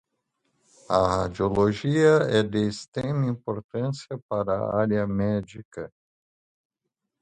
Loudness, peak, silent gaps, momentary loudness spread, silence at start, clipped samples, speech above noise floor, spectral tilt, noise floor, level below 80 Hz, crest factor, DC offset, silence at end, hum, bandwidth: -25 LUFS; -6 dBFS; 2.88-2.92 s, 3.64-3.69 s, 4.22-4.29 s, 5.65-5.71 s; 14 LU; 0.9 s; under 0.1%; 59 dB; -7 dB/octave; -83 dBFS; -50 dBFS; 20 dB; under 0.1%; 1.35 s; none; 9.4 kHz